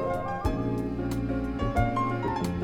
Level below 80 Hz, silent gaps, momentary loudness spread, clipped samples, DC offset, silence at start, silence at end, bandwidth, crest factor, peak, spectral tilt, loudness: -38 dBFS; none; 4 LU; under 0.1%; under 0.1%; 0 s; 0 s; 17.5 kHz; 18 dB; -12 dBFS; -7.5 dB/octave; -29 LUFS